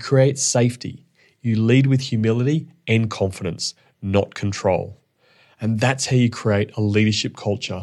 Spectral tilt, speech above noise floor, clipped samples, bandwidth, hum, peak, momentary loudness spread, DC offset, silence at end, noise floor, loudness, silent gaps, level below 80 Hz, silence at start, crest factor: -5.5 dB/octave; 38 dB; under 0.1%; 12 kHz; none; -4 dBFS; 10 LU; under 0.1%; 0 s; -57 dBFS; -20 LUFS; none; -60 dBFS; 0 s; 16 dB